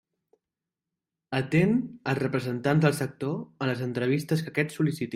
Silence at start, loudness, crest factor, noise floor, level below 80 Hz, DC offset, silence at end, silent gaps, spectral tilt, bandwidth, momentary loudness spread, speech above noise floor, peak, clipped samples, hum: 1.3 s; -27 LUFS; 18 dB; -89 dBFS; -64 dBFS; under 0.1%; 0 s; none; -7 dB/octave; 16 kHz; 8 LU; 62 dB; -10 dBFS; under 0.1%; none